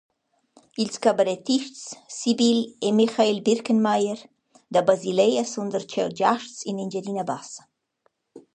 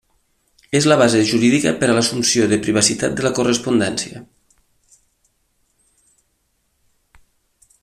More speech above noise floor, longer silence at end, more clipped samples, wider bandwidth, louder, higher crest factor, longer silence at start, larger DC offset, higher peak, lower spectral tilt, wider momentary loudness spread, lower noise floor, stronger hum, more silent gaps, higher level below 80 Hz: about the same, 47 dB vs 50 dB; second, 0.15 s vs 3.6 s; neither; second, 9.8 kHz vs 14 kHz; second, -23 LUFS vs -16 LUFS; about the same, 20 dB vs 20 dB; about the same, 0.8 s vs 0.7 s; neither; second, -4 dBFS vs 0 dBFS; about the same, -4.5 dB/octave vs -4 dB/octave; first, 13 LU vs 8 LU; about the same, -70 dBFS vs -67 dBFS; neither; neither; second, -74 dBFS vs -54 dBFS